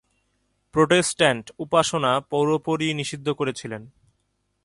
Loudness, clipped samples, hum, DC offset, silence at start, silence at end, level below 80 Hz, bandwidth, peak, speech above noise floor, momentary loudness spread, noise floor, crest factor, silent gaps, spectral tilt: -22 LUFS; under 0.1%; 50 Hz at -50 dBFS; under 0.1%; 0.75 s; 0.75 s; -60 dBFS; 11.5 kHz; -4 dBFS; 50 dB; 11 LU; -72 dBFS; 20 dB; none; -4 dB/octave